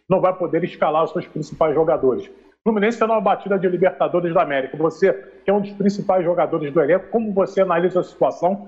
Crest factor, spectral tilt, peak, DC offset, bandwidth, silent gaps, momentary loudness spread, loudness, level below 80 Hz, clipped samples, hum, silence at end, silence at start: 12 dB; -7.5 dB/octave; -6 dBFS; under 0.1%; 8 kHz; none; 4 LU; -20 LUFS; -58 dBFS; under 0.1%; none; 0 s; 0.1 s